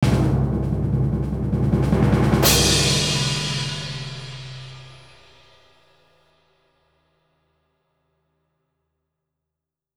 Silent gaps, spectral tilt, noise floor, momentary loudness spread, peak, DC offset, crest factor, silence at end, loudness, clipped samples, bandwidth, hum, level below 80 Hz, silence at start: none; -4.5 dB/octave; -85 dBFS; 20 LU; -2 dBFS; under 0.1%; 20 dB; 5 s; -20 LUFS; under 0.1%; over 20 kHz; none; -34 dBFS; 0 s